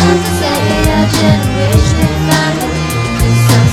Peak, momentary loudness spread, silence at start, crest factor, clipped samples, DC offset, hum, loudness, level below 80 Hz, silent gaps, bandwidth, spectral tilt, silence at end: 0 dBFS; 5 LU; 0 s; 10 dB; 0.2%; under 0.1%; none; -11 LUFS; -22 dBFS; none; 16.5 kHz; -5.5 dB/octave; 0 s